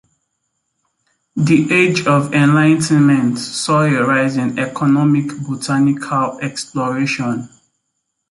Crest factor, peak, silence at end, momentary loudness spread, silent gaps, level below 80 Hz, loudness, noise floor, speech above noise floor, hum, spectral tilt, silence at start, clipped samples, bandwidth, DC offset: 14 dB; -2 dBFS; 0.85 s; 10 LU; none; -56 dBFS; -15 LUFS; -73 dBFS; 58 dB; none; -6 dB/octave; 1.35 s; under 0.1%; 11.5 kHz; under 0.1%